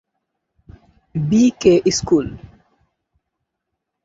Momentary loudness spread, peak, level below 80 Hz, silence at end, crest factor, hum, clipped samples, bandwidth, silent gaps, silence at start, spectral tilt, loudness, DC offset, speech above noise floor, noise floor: 14 LU; -2 dBFS; -46 dBFS; 1.6 s; 18 dB; none; under 0.1%; 7.8 kHz; none; 1.15 s; -5.5 dB/octave; -16 LUFS; under 0.1%; 63 dB; -78 dBFS